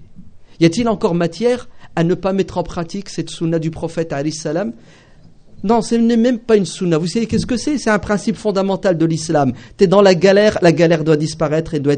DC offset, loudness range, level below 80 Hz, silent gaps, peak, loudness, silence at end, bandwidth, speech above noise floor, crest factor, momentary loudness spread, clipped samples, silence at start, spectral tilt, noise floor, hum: under 0.1%; 7 LU; -42 dBFS; none; 0 dBFS; -16 LUFS; 0 s; 9.4 kHz; 27 dB; 16 dB; 11 LU; under 0.1%; 0 s; -6 dB/octave; -43 dBFS; none